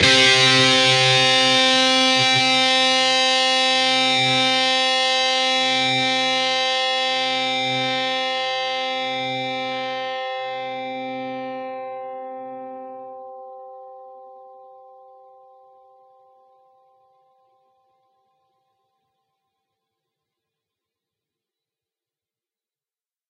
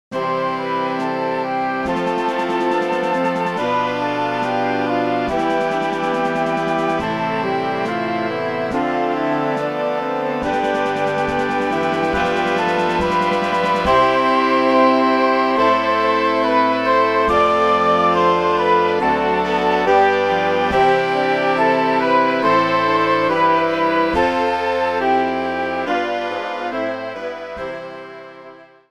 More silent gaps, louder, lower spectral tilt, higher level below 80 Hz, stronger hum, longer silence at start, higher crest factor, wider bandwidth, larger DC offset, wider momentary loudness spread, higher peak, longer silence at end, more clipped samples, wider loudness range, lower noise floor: neither; about the same, -17 LUFS vs -18 LUFS; second, -2 dB/octave vs -5.5 dB/octave; second, -62 dBFS vs -46 dBFS; neither; about the same, 0 s vs 0.1 s; about the same, 20 dB vs 16 dB; about the same, 12 kHz vs 13 kHz; second, under 0.1% vs 0.2%; first, 20 LU vs 6 LU; about the same, -2 dBFS vs -2 dBFS; first, 8.75 s vs 0.25 s; neither; first, 20 LU vs 5 LU; first, under -90 dBFS vs -42 dBFS